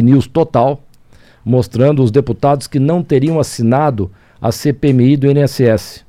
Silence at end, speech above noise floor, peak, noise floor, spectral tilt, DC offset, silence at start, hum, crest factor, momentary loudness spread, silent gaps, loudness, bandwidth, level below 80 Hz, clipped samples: 0.1 s; 32 dB; 0 dBFS; -44 dBFS; -7.5 dB/octave; under 0.1%; 0 s; none; 12 dB; 8 LU; none; -13 LUFS; 15 kHz; -42 dBFS; under 0.1%